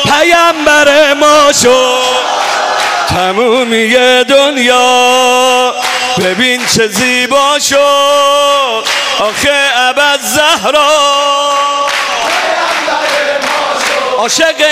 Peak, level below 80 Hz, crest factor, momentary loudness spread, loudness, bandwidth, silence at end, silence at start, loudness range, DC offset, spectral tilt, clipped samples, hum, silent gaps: 0 dBFS; -44 dBFS; 8 dB; 5 LU; -8 LUFS; 16 kHz; 0 s; 0 s; 2 LU; under 0.1%; -1.5 dB/octave; 0.5%; none; none